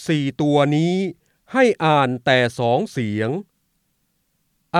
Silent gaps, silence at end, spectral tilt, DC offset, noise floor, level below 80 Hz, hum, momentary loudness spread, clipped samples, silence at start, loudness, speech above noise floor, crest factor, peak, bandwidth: none; 0 s; -6.5 dB/octave; under 0.1%; -69 dBFS; -64 dBFS; none; 8 LU; under 0.1%; 0 s; -19 LUFS; 50 dB; 18 dB; -2 dBFS; 12.5 kHz